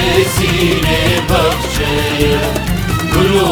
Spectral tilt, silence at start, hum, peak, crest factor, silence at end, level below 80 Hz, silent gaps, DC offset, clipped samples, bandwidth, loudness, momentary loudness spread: -4.5 dB/octave; 0 s; none; 0 dBFS; 12 dB; 0 s; -24 dBFS; none; under 0.1%; under 0.1%; over 20 kHz; -13 LUFS; 4 LU